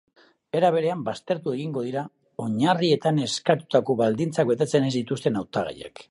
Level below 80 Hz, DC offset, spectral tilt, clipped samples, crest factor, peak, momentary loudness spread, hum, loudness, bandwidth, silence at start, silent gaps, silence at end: -64 dBFS; under 0.1%; -6 dB/octave; under 0.1%; 18 dB; -6 dBFS; 9 LU; none; -24 LUFS; 11.5 kHz; 0.55 s; none; 0.1 s